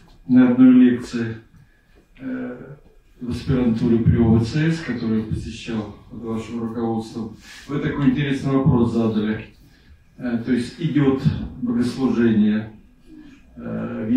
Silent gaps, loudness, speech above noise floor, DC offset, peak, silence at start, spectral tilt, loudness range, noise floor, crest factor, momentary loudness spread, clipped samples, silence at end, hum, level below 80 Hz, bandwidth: none; -20 LUFS; 34 dB; under 0.1%; -4 dBFS; 0.25 s; -8 dB/octave; 5 LU; -54 dBFS; 16 dB; 16 LU; under 0.1%; 0 s; none; -44 dBFS; 9.8 kHz